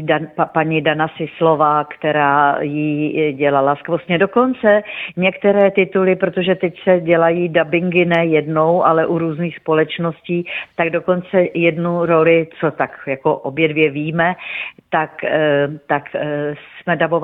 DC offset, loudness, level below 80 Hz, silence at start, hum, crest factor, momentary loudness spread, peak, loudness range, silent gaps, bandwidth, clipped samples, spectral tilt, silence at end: under 0.1%; -16 LUFS; -58 dBFS; 0 s; none; 16 dB; 8 LU; 0 dBFS; 3 LU; none; 4 kHz; under 0.1%; -9.5 dB/octave; 0 s